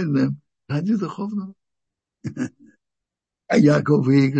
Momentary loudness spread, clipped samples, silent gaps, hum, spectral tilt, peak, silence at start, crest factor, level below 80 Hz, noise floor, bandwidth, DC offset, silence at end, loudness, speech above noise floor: 18 LU; under 0.1%; none; none; -8 dB/octave; -4 dBFS; 0 s; 18 dB; -64 dBFS; -86 dBFS; 8.6 kHz; under 0.1%; 0 s; -21 LUFS; 67 dB